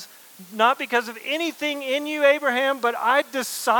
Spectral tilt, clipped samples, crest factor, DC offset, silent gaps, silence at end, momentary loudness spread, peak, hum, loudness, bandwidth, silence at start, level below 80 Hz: -1.5 dB/octave; under 0.1%; 18 dB; under 0.1%; none; 0 s; 8 LU; -4 dBFS; none; -22 LUFS; 19 kHz; 0 s; under -90 dBFS